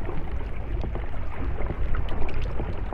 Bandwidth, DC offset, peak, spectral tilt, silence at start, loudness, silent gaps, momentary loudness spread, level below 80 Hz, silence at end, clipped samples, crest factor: 3.9 kHz; under 0.1%; -10 dBFS; -8.5 dB/octave; 0 s; -33 LUFS; none; 3 LU; -28 dBFS; 0 s; under 0.1%; 14 dB